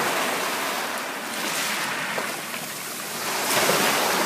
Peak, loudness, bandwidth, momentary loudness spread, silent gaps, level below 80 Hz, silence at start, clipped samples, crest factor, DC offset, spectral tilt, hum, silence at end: -8 dBFS; -24 LUFS; 15.5 kHz; 10 LU; none; -70 dBFS; 0 s; under 0.1%; 18 dB; under 0.1%; -1.5 dB/octave; none; 0 s